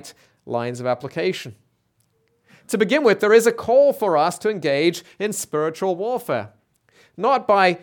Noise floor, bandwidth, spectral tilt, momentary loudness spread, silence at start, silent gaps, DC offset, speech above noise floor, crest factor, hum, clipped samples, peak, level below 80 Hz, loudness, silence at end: -66 dBFS; 19 kHz; -4.5 dB/octave; 11 LU; 0.05 s; none; under 0.1%; 47 dB; 18 dB; none; under 0.1%; -2 dBFS; -68 dBFS; -20 LUFS; 0.05 s